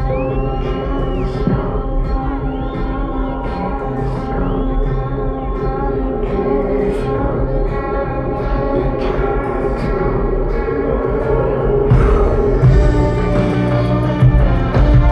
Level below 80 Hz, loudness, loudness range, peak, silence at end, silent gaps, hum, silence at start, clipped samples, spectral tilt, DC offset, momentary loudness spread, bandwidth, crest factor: -20 dBFS; -17 LUFS; 7 LU; -2 dBFS; 0 s; none; none; 0 s; under 0.1%; -9.5 dB/octave; under 0.1%; 8 LU; 6.2 kHz; 14 dB